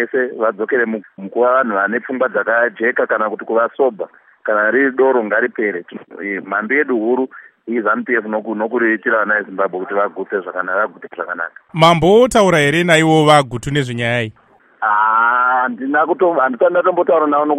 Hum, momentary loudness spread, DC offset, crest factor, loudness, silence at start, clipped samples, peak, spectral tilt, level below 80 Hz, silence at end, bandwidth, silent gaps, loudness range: none; 12 LU; under 0.1%; 16 dB; -15 LUFS; 0 s; under 0.1%; 0 dBFS; -5.5 dB/octave; -50 dBFS; 0 s; 15.5 kHz; none; 5 LU